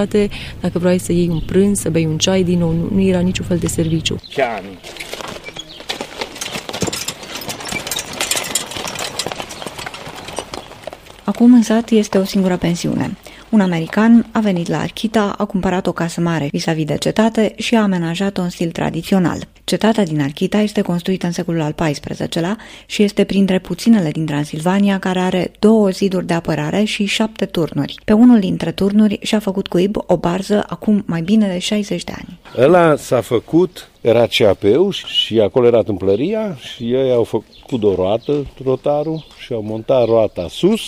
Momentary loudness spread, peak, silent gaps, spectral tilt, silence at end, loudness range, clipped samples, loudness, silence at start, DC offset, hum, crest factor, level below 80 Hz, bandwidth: 13 LU; -2 dBFS; none; -5.5 dB/octave; 0 s; 7 LU; under 0.1%; -16 LUFS; 0 s; under 0.1%; none; 14 dB; -42 dBFS; 16 kHz